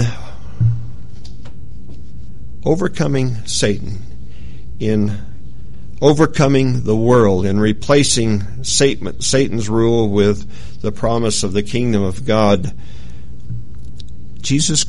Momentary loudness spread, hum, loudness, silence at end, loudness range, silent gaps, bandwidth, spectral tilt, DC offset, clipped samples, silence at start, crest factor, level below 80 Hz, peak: 24 LU; none; -16 LUFS; 0 s; 7 LU; none; 11.5 kHz; -5 dB/octave; 9%; under 0.1%; 0 s; 18 dB; -36 dBFS; 0 dBFS